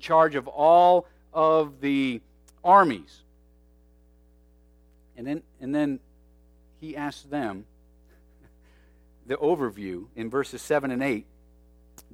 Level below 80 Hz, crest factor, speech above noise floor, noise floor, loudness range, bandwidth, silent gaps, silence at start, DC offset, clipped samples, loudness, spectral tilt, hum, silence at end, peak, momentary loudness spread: -58 dBFS; 20 dB; 34 dB; -58 dBFS; 13 LU; 15 kHz; none; 0 s; under 0.1%; under 0.1%; -24 LUFS; -6 dB/octave; none; 0.9 s; -6 dBFS; 18 LU